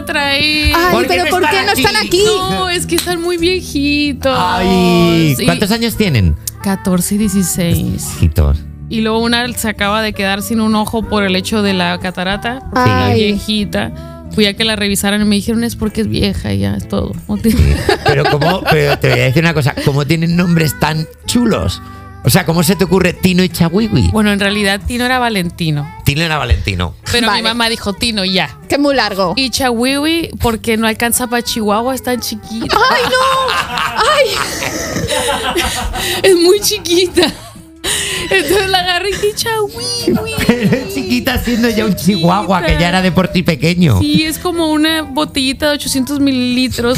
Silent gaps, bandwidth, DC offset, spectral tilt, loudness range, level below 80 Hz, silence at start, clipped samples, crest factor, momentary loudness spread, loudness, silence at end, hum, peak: none; 16.5 kHz; under 0.1%; -4.5 dB/octave; 2 LU; -30 dBFS; 0 s; under 0.1%; 14 dB; 6 LU; -13 LUFS; 0 s; none; 0 dBFS